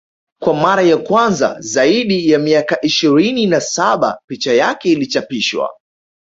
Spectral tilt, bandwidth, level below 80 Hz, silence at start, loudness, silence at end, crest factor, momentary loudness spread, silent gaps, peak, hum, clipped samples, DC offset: -4 dB/octave; 8 kHz; -56 dBFS; 0.4 s; -14 LUFS; 0.55 s; 14 dB; 6 LU; 4.24-4.28 s; -2 dBFS; none; under 0.1%; under 0.1%